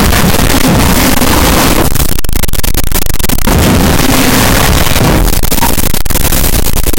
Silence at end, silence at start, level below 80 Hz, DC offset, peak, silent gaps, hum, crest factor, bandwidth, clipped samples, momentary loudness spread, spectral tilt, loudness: 0 s; 0 s; -12 dBFS; 5%; 0 dBFS; none; none; 6 dB; 17.5 kHz; under 0.1%; 5 LU; -4 dB/octave; -9 LUFS